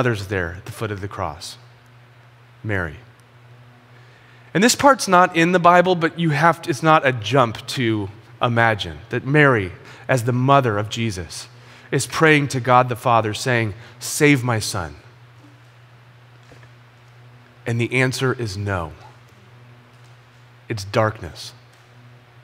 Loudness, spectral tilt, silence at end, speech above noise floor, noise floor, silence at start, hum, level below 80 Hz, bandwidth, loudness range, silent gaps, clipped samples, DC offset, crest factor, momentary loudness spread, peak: -19 LUFS; -5 dB/octave; 0.95 s; 29 dB; -48 dBFS; 0 s; none; -52 dBFS; 16 kHz; 13 LU; none; under 0.1%; under 0.1%; 20 dB; 16 LU; 0 dBFS